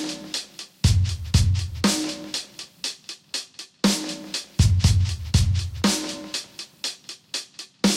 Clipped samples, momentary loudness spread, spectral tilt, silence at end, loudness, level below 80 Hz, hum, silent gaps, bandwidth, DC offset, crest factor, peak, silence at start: under 0.1%; 11 LU; -4.5 dB/octave; 0 s; -24 LUFS; -34 dBFS; none; none; 16 kHz; under 0.1%; 18 dB; -6 dBFS; 0 s